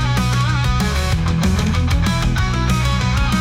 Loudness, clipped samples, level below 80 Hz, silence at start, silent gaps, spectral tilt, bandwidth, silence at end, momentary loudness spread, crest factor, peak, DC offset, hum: -18 LUFS; under 0.1%; -22 dBFS; 0 s; none; -5.5 dB/octave; 16.5 kHz; 0 s; 1 LU; 10 dB; -6 dBFS; under 0.1%; none